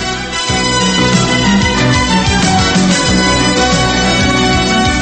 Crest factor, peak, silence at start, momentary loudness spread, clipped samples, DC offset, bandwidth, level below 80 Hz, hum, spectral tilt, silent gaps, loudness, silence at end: 12 dB; 0 dBFS; 0 s; 1 LU; under 0.1%; under 0.1%; 8.8 kHz; -24 dBFS; none; -4 dB/octave; none; -11 LUFS; 0 s